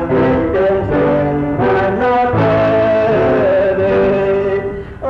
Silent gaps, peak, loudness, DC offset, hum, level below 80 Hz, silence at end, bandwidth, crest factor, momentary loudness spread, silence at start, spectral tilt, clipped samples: none; -6 dBFS; -13 LUFS; under 0.1%; none; -34 dBFS; 0 s; 6.6 kHz; 6 dB; 3 LU; 0 s; -9 dB/octave; under 0.1%